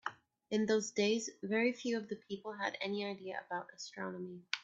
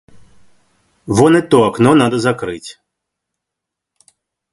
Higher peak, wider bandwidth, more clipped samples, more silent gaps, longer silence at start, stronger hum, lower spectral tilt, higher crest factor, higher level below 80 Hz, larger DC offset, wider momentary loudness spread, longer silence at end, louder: second, -14 dBFS vs 0 dBFS; second, 8 kHz vs 11.5 kHz; neither; neither; second, 0.05 s vs 1.05 s; neither; second, -4 dB/octave vs -6 dB/octave; first, 24 dB vs 16 dB; second, -82 dBFS vs -50 dBFS; neither; second, 11 LU vs 15 LU; second, 0 s vs 1.8 s; second, -38 LUFS vs -13 LUFS